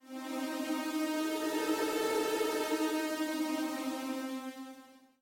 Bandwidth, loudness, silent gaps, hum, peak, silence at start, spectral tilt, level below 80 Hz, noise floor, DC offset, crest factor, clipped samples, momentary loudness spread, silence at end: 17 kHz; -34 LUFS; none; none; -20 dBFS; 0.05 s; -2 dB/octave; -78 dBFS; -56 dBFS; under 0.1%; 14 dB; under 0.1%; 9 LU; 0.25 s